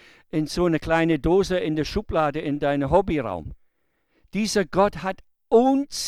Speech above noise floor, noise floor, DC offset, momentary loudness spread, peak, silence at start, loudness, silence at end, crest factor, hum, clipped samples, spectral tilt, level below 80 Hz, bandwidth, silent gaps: 47 dB; -69 dBFS; under 0.1%; 12 LU; -4 dBFS; 0.35 s; -23 LUFS; 0 s; 18 dB; none; under 0.1%; -5.5 dB/octave; -42 dBFS; 15 kHz; none